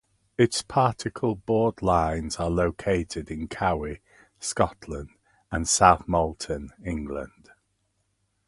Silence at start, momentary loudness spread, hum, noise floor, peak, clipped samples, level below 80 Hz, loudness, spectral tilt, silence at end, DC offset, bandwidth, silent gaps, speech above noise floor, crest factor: 0.4 s; 16 LU; none; -73 dBFS; -2 dBFS; under 0.1%; -42 dBFS; -25 LUFS; -4.5 dB/octave; 1.2 s; under 0.1%; 11.5 kHz; none; 48 dB; 24 dB